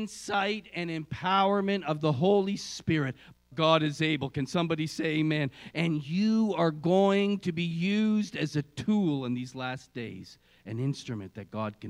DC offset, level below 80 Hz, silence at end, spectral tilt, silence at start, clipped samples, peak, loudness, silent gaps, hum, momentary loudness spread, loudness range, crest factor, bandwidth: under 0.1%; -66 dBFS; 0 s; -6 dB/octave; 0 s; under 0.1%; -8 dBFS; -29 LUFS; none; none; 12 LU; 4 LU; 20 dB; 12 kHz